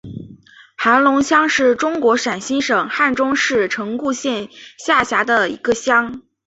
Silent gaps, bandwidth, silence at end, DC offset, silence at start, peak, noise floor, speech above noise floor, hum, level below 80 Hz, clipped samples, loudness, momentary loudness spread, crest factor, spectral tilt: none; 8.2 kHz; 0.25 s; under 0.1%; 0.05 s; 0 dBFS; -44 dBFS; 27 dB; none; -54 dBFS; under 0.1%; -16 LUFS; 10 LU; 16 dB; -3 dB/octave